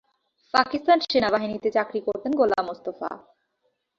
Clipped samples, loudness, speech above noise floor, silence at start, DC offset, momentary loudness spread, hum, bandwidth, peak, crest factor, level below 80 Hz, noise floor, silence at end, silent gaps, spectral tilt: under 0.1%; -24 LUFS; 50 dB; 0.55 s; under 0.1%; 12 LU; none; 7.6 kHz; -4 dBFS; 22 dB; -62 dBFS; -74 dBFS; 0.8 s; none; -5 dB/octave